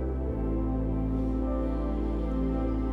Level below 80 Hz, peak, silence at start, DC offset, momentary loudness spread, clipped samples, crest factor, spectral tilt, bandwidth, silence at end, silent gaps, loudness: -32 dBFS; -20 dBFS; 0 s; under 0.1%; 2 LU; under 0.1%; 10 dB; -10.5 dB/octave; 3.7 kHz; 0 s; none; -30 LUFS